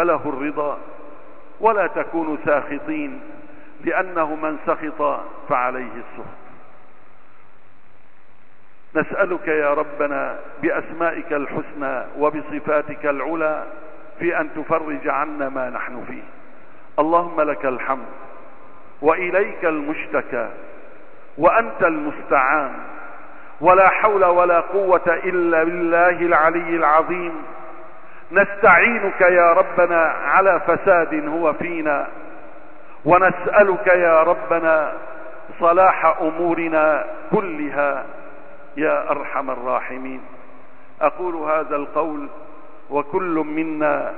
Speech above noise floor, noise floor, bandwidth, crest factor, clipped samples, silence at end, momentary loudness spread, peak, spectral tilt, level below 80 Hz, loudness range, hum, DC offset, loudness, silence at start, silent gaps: 36 dB; -54 dBFS; 4.3 kHz; 18 dB; under 0.1%; 0 s; 17 LU; -2 dBFS; -11 dB/octave; -56 dBFS; 9 LU; none; 3%; -19 LUFS; 0 s; none